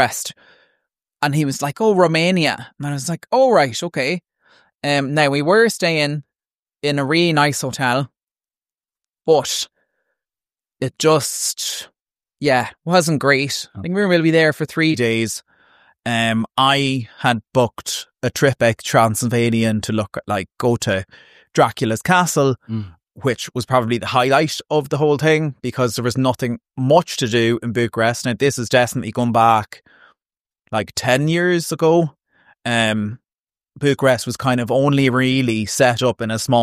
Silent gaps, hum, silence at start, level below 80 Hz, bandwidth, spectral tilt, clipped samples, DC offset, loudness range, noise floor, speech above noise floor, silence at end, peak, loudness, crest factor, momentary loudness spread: 6.59-6.63 s, 8.23-8.27 s, 30.40-30.44 s, 33.39-33.44 s; none; 0 s; -56 dBFS; 15.5 kHz; -4.5 dB/octave; under 0.1%; under 0.1%; 3 LU; under -90 dBFS; over 73 dB; 0 s; -2 dBFS; -18 LUFS; 18 dB; 10 LU